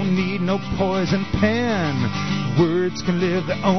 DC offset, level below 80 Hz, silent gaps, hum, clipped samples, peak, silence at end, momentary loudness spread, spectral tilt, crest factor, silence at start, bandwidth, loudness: 1%; -42 dBFS; none; none; under 0.1%; -6 dBFS; 0 s; 4 LU; -6.5 dB/octave; 14 dB; 0 s; 6.4 kHz; -21 LUFS